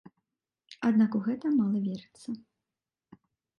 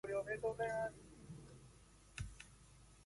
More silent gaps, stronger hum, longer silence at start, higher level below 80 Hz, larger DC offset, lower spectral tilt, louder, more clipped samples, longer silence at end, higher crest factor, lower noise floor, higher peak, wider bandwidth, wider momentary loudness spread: neither; neither; first, 0.7 s vs 0.05 s; second, -76 dBFS vs -62 dBFS; neither; first, -8 dB/octave vs -5 dB/octave; first, -28 LUFS vs -44 LUFS; neither; first, 1.2 s vs 0 s; about the same, 16 dB vs 18 dB; first, under -90 dBFS vs -64 dBFS; first, -16 dBFS vs -30 dBFS; second, 9.6 kHz vs 11.5 kHz; second, 16 LU vs 23 LU